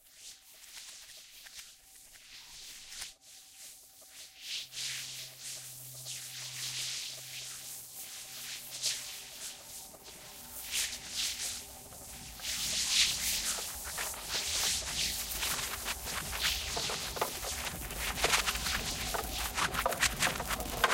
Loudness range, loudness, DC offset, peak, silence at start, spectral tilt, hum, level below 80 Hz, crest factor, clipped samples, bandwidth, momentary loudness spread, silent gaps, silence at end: 13 LU; -34 LUFS; under 0.1%; -12 dBFS; 0.05 s; -0.5 dB/octave; none; -52 dBFS; 26 dB; under 0.1%; 17 kHz; 20 LU; none; 0 s